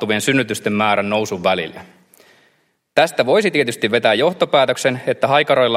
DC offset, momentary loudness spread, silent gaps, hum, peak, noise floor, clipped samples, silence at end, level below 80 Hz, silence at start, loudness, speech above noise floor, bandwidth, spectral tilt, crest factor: under 0.1%; 5 LU; none; none; 0 dBFS; -62 dBFS; under 0.1%; 0 s; -62 dBFS; 0 s; -16 LUFS; 45 dB; 16 kHz; -4 dB/octave; 18 dB